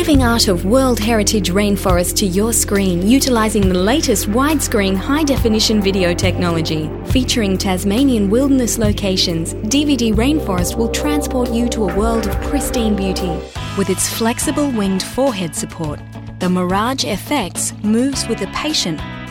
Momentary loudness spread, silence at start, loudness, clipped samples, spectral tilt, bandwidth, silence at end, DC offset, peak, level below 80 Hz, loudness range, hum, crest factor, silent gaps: 6 LU; 0 s; -16 LUFS; under 0.1%; -4.5 dB/octave; 18 kHz; 0 s; under 0.1%; 0 dBFS; -28 dBFS; 4 LU; none; 14 dB; none